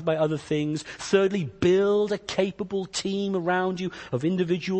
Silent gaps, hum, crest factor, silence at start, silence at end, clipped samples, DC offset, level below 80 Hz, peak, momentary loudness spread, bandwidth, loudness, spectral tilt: none; none; 18 dB; 0 s; 0 s; under 0.1%; under 0.1%; -58 dBFS; -8 dBFS; 8 LU; 8.8 kHz; -26 LUFS; -5.5 dB/octave